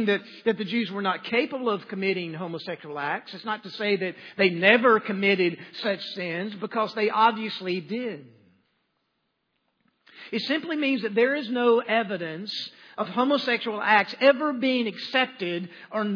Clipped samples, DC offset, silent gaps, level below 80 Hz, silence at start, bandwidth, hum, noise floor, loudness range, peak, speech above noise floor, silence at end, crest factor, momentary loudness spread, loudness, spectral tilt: under 0.1%; under 0.1%; none; -86 dBFS; 0 s; 5.4 kHz; none; -76 dBFS; 6 LU; -4 dBFS; 50 dB; 0 s; 22 dB; 12 LU; -25 LUFS; -6.5 dB/octave